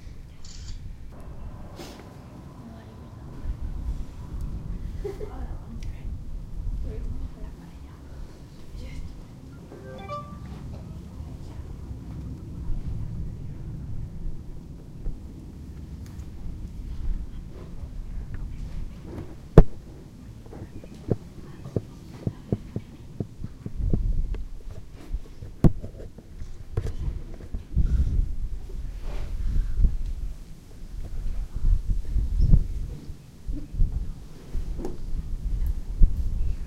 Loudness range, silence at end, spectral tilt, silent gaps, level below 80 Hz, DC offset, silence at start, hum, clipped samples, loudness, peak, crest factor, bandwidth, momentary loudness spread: 12 LU; 0 s; -8.5 dB/octave; none; -30 dBFS; under 0.1%; 0 s; none; under 0.1%; -33 LUFS; 0 dBFS; 28 dB; 7.8 kHz; 17 LU